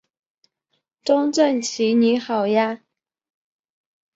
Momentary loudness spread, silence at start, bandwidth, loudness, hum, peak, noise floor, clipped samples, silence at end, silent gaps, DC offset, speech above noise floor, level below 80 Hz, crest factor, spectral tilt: 8 LU; 1.05 s; 8 kHz; -20 LUFS; none; -4 dBFS; -74 dBFS; under 0.1%; 1.4 s; none; under 0.1%; 55 dB; -72 dBFS; 18 dB; -4 dB/octave